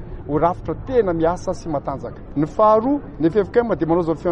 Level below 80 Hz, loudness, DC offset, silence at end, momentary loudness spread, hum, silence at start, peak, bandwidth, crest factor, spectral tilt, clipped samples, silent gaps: -38 dBFS; -20 LUFS; under 0.1%; 0 s; 11 LU; none; 0 s; -4 dBFS; 8.8 kHz; 14 dB; -8 dB/octave; under 0.1%; none